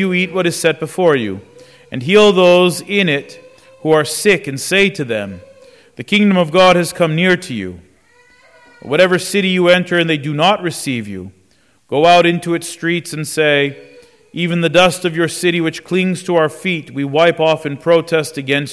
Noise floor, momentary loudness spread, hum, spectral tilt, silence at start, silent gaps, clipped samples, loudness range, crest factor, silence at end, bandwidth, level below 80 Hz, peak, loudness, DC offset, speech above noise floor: -55 dBFS; 11 LU; none; -4.5 dB/octave; 0 s; none; under 0.1%; 2 LU; 14 dB; 0 s; 11 kHz; -54 dBFS; -2 dBFS; -14 LUFS; under 0.1%; 41 dB